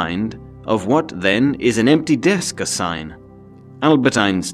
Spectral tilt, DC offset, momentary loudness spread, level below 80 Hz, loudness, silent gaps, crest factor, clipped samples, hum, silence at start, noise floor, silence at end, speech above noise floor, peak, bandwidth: -4.5 dB/octave; under 0.1%; 11 LU; -48 dBFS; -17 LUFS; none; 16 dB; under 0.1%; none; 0 s; -41 dBFS; 0 s; 24 dB; 0 dBFS; 13.5 kHz